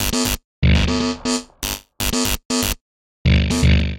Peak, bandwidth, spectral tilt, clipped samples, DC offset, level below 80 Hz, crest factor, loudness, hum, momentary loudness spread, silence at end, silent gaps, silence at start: -2 dBFS; 17.5 kHz; -4.5 dB/octave; under 0.1%; under 0.1%; -24 dBFS; 16 dB; -19 LUFS; none; 9 LU; 0 s; 0.44-0.62 s, 2.45-2.50 s, 2.81-3.25 s; 0 s